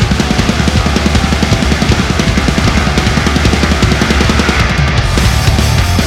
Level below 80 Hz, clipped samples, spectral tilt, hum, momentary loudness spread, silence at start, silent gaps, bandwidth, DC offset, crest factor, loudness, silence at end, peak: -16 dBFS; under 0.1%; -5 dB/octave; none; 1 LU; 0 s; none; 16 kHz; under 0.1%; 10 dB; -11 LUFS; 0 s; 0 dBFS